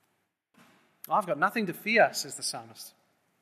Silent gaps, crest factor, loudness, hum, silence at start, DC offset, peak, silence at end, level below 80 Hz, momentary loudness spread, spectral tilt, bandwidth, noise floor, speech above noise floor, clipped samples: none; 22 dB; -28 LUFS; none; 1.1 s; under 0.1%; -8 dBFS; 0.55 s; -86 dBFS; 23 LU; -3 dB/octave; 14.5 kHz; -77 dBFS; 48 dB; under 0.1%